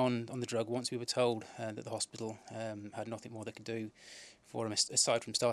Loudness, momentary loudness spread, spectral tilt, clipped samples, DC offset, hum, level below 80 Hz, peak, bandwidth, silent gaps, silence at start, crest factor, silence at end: -36 LUFS; 15 LU; -3 dB/octave; under 0.1%; under 0.1%; none; -80 dBFS; -16 dBFS; 13.5 kHz; none; 0 s; 20 dB; 0 s